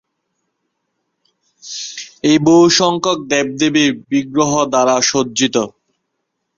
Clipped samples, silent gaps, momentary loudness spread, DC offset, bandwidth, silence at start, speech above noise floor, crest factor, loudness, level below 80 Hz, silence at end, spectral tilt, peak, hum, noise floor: under 0.1%; none; 16 LU; under 0.1%; 7.6 kHz; 1.65 s; 59 dB; 16 dB; -14 LUFS; -56 dBFS; 0.9 s; -3.5 dB/octave; 0 dBFS; none; -73 dBFS